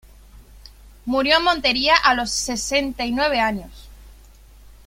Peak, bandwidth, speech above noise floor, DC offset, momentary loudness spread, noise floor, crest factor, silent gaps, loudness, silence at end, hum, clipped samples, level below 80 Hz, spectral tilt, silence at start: -2 dBFS; 16.5 kHz; 26 dB; under 0.1%; 9 LU; -46 dBFS; 20 dB; none; -19 LUFS; 0.2 s; none; under 0.1%; -42 dBFS; -2 dB/octave; 0.35 s